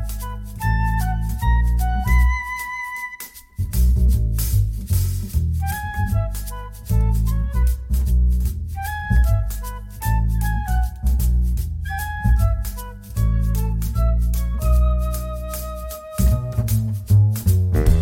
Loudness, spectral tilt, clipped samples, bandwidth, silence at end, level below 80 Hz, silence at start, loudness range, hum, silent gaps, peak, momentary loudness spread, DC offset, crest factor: -22 LUFS; -6 dB/octave; under 0.1%; 17 kHz; 0 s; -20 dBFS; 0 s; 1 LU; none; none; -4 dBFS; 11 LU; under 0.1%; 16 dB